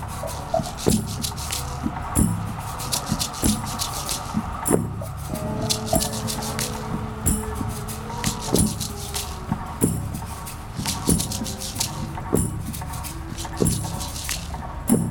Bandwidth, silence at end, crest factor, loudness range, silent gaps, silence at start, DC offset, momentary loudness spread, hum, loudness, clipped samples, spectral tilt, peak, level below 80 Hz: over 20 kHz; 0 s; 24 dB; 2 LU; none; 0 s; under 0.1%; 9 LU; none; -25 LUFS; under 0.1%; -4 dB/octave; -2 dBFS; -36 dBFS